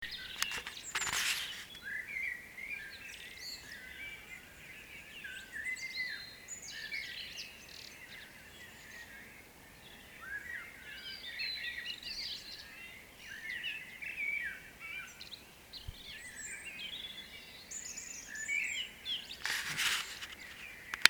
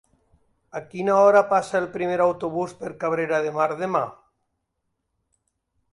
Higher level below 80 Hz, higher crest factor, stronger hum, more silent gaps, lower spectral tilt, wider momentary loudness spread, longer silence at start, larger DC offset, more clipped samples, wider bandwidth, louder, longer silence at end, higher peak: about the same, -64 dBFS vs -66 dBFS; first, 42 dB vs 18 dB; neither; neither; second, 0.5 dB/octave vs -6 dB/octave; about the same, 15 LU vs 16 LU; second, 0 s vs 0.75 s; neither; neither; first, over 20 kHz vs 11.5 kHz; second, -40 LUFS vs -22 LUFS; second, 0 s vs 1.8 s; first, 0 dBFS vs -6 dBFS